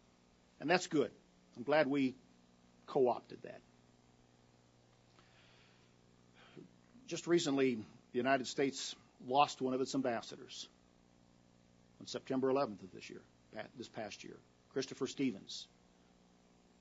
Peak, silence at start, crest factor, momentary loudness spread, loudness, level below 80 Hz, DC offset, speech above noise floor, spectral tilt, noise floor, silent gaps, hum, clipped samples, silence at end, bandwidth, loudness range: -14 dBFS; 0.6 s; 26 dB; 21 LU; -37 LUFS; -80 dBFS; under 0.1%; 32 dB; -3.5 dB/octave; -69 dBFS; none; 60 Hz at -70 dBFS; under 0.1%; 1.15 s; 7.6 kHz; 8 LU